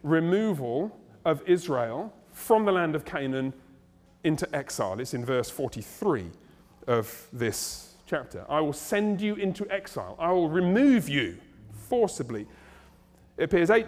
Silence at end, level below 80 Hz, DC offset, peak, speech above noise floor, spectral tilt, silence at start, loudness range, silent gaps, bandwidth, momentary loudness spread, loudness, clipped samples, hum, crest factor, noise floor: 0 s; -58 dBFS; under 0.1%; -8 dBFS; 31 dB; -5.5 dB/octave; 0.05 s; 5 LU; none; 16.5 kHz; 14 LU; -28 LUFS; under 0.1%; none; 18 dB; -58 dBFS